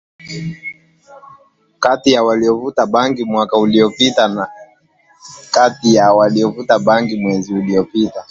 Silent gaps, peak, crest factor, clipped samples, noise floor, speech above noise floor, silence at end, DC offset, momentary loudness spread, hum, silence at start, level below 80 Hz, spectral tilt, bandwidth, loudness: none; 0 dBFS; 14 dB; under 0.1%; -53 dBFS; 39 dB; 0.1 s; under 0.1%; 14 LU; none; 0.25 s; -54 dBFS; -5 dB/octave; 7.8 kHz; -14 LUFS